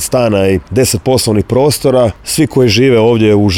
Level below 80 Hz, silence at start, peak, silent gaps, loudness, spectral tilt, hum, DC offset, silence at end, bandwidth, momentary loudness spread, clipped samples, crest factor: -36 dBFS; 0 s; 0 dBFS; none; -10 LUFS; -5 dB/octave; none; under 0.1%; 0 s; 18.5 kHz; 4 LU; under 0.1%; 10 dB